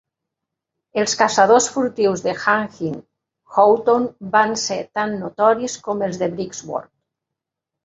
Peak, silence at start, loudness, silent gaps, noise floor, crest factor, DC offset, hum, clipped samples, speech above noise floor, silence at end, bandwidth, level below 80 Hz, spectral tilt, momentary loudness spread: 0 dBFS; 0.95 s; -19 LUFS; none; -84 dBFS; 20 dB; under 0.1%; none; under 0.1%; 66 dB; 1.05 s; 8 kHz; -64 dBFS; -3.5 dB/octave; 14 LU